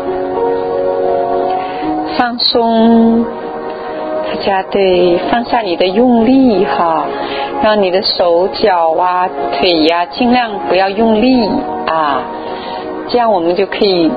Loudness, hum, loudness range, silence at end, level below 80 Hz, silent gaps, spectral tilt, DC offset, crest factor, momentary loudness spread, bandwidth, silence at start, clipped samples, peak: -12 LUFS; none; 2 LU; 0 s; -42 dBFS; none; -7.5 dB/octave; under 0.1%; 12 dB; 9 LU; 5 kHz; 0 s; under 0.1%; 0 dBFS